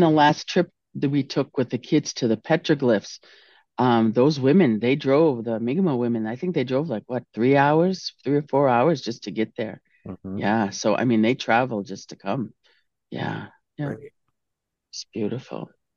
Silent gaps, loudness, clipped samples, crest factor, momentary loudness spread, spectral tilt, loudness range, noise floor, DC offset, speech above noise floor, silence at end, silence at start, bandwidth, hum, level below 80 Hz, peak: none; -23 LUFS; under 0.1%; 18 dB; 17 LU; -6 dB/octave; 11 LU; -82 dBFS; under 0.1%; 60 dB; 0.3 s; 0 s; 7.2 kHz; none; -70 dBFS; -6 dBFS